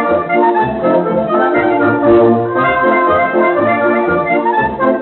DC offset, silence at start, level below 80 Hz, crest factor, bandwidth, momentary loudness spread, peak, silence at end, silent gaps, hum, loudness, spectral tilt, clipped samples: under 0.1%; 0 s; -44 dBFS; 12 dB; 4.2 kHz; 4 LU; 0 dBFS; 0 s; none; none; -12 LUFS; -5 dB/octave; under 0.1%